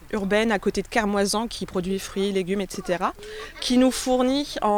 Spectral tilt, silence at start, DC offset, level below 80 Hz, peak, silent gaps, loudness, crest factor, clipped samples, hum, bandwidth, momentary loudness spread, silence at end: -4.5 dB/octave; 0 s; under 0.1%; -46 dBFS; -8 dBFS; none; -24 LUFS; 16 dB; under 0.1%; none; 19.5 kHz; 8 LU; 0 s